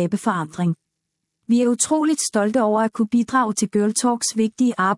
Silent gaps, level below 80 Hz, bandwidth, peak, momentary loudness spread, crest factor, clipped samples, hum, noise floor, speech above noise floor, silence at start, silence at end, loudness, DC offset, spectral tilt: none; -66 dBFS; 12 kHz; -6 dBFS; 5 LU; 14 dB; under 0.1%; none; -78 dBFS; 59 dB; 0 s; 0 s; -20 LUFS; under 0.1%; -4.5 dB/octave